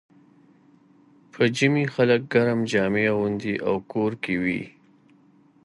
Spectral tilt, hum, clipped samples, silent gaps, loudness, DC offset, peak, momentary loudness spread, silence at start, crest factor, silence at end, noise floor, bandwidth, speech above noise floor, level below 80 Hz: -6 dB/octave; none; under 0.1%; none; -23 LUFS; under 0.1%; -6 dBFS; 6 LU; 1.35 s; 18 dB; 0.95 s; -57 dBFS; 11.5 kHz; 34 dB; -60 dBFS